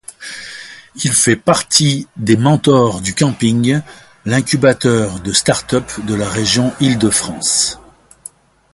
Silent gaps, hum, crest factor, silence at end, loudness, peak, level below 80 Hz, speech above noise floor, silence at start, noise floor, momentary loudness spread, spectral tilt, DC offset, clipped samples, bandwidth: none; none; 16 dB; 0.95 s; -14 LUFS; 0 dBFS; -44 dBFS; 25 dB; 0.2 s; -39 dBFS; 16 LU; -4 dB/octave; under 0.1%; under 0.1%; 12 kHz